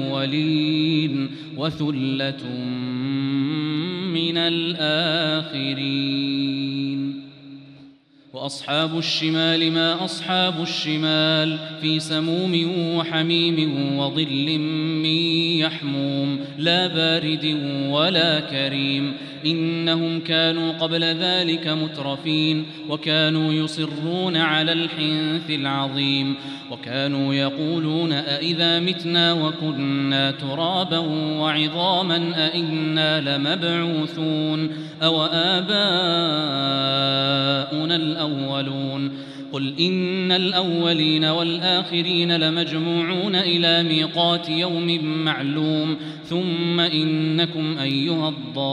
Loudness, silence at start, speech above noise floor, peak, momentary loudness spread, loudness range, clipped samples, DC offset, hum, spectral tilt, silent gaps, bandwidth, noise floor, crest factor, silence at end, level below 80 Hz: -21 LUFS; 0 s; 28 dB; -4 dBFS; 7 LU; 4 LU; under 0.1%; under 0.1%; none; -6 dB/octave; none; 10.5 kHz; -50 dBFS; 18 dB; 0 s; -70 dBFS